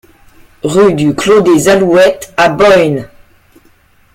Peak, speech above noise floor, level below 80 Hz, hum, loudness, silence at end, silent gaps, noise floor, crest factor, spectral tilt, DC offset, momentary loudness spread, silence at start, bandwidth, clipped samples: 0 dBFS; 39 dB; -42 dBFS; none; -9 LUFS; 1.1 s; none; -47 dBFS; 10 dB; -5 dB/octave; under 0.1%; 7 LU; 0.65 s; 16.5 kHz; under 0.1%